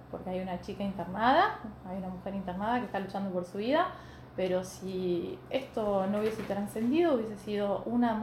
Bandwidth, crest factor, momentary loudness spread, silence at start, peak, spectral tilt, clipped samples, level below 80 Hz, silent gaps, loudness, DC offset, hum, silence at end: 15.5 kHz; 20 dB; 11 LU; 0 s; -12 dBFS; -6.5 dB/octave; under 0.1%; -58 dBFS; none; -32 LUFS; under 0.1%; none; 0 s